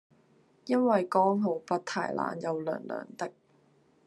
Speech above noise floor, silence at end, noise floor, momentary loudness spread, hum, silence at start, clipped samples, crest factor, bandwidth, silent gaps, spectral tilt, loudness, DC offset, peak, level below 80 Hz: 36 dB; 0.75 s; -65 dBFS; 14 LU; none; 0.65 s; under 0.1%; 20 dB; 12 kHz; none; -6.5 dB/octave; -30 LUFS; under 0.1%; -12 dBFS; -80 dBFS